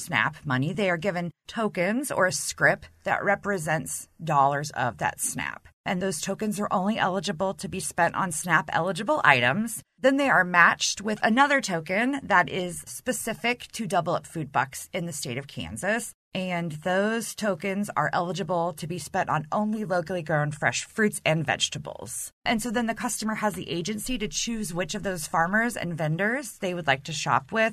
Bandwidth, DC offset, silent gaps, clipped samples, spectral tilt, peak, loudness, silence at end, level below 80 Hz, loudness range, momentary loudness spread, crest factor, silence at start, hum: 13.5 kHz; under 0.1%; 5.73-5.84 s, 16.14-16.31 s, 22.33-22.42 s; under 0.1%; -4 dB/octave; -2 dBFS; -26 LUFS; 0 s; -54 dBFS; 7 LU; 10 LU; 24 dB; 0 s; none